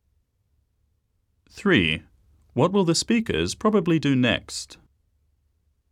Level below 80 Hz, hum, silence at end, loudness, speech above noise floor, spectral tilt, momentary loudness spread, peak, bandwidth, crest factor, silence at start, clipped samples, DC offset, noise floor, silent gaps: -52 dBFS; none; 1.2 s; -22 LUFS; 48 dB; -5 dB/octave; 12 LU; -6 dBFS; 14.5 kHz; 20 dB; 1.55 s; under 0.1%; under 0.1%; -70 dBFS; none